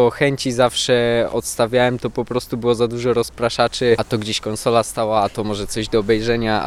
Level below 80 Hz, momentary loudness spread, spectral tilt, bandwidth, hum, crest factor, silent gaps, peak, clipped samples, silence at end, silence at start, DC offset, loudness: -42 dBFS; 6 LU; -4.5 dB/octave; 15.5 kHz; none; 16 dB; none; -2 dBFS; under 0.1%; 0 s; 0 s; under 0.1%; -19 LUFS